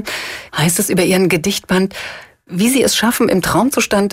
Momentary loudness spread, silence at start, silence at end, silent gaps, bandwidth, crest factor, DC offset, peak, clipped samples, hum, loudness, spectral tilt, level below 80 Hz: 11 LU; 0 s; 0 s; none; 16.5 kHz; 12 dB; under 0.1%; -2 dBFS; under 0.1%; none; -15 LUFS; -4 dB/octave; -44 dBFS